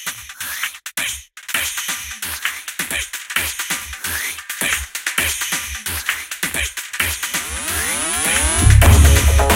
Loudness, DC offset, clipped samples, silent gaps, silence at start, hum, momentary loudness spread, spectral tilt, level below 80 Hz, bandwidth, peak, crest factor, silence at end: -18 LUFS; under 0.1%; under 0.1%; none; 0 s; none; 12 LU; -3 dB/octave; -22 dBFS; 17 kHz; 0 dBFS; 18 dB; 0 s